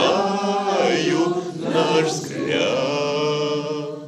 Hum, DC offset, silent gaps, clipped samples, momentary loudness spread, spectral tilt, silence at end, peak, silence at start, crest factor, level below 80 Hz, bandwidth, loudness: none; under 0.1%; none; under 0.1%; 5 LU; -4.5 dB/octave; 0 s; -4 dBFS; 0 s; 18 dB; -68 dBFS; 13 kHz; -21 LUFS